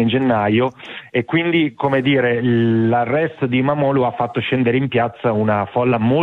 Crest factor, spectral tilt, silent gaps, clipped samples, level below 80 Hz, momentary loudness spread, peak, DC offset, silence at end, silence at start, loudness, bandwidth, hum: 12 dB; -9 dB/octave; none; under 0.1%; -56 dBFS; 4 LU; -4 dBFS; under 0.1%; 0 s; 0 s; -17 LUFS; 4.3 kHz; none